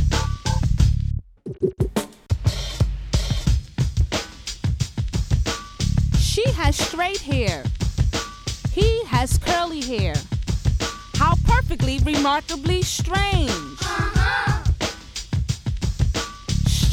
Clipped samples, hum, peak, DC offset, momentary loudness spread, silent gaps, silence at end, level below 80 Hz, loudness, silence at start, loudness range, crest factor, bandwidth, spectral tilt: under 0.1%; none; -4 dBFS; under 0.1%; 7 LU; none; 0 s; -26 dBFS; -23 LUFS; 0 s; 3 LU; 16 dB; 16 kHz; -5 dB/octave